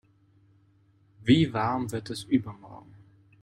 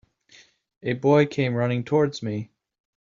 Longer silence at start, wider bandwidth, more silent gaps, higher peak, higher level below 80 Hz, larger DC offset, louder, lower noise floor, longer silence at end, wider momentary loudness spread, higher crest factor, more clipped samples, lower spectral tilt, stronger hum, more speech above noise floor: first, 1.2 s vs 0.85 s; first, 13.5 kHz vs 7.6 kHz; neither; about the same, -8 dBFS vs -6 dBFS; about the same, -60 dBFS vs -64 dBFS; neither; second, -27 LUFS vs -23 LUFS; first, -63 dBFS vs -55 dBFS; about the same, 0.65 s vs 0.55 s; first, 25 LU vs 14 LU; about the same, 20 dB vs 18 dB; neither; about the same, -6.5 dB/octave vs -6.5 dB/octave; neither; about the same, 36 dB vs 33 dB